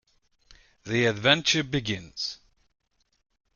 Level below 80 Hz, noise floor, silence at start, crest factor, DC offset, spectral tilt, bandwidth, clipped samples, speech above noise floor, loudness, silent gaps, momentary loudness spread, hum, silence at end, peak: -58 dBFS; -62 dBFS; 0.85 s; 26 dB; under 0.1%; -3.5 dB/octave; 7.4 kHz; under 0.1%; 36 dB; -25 LUFS; none; 15 LU; none; 1.2 s; -2 dBFS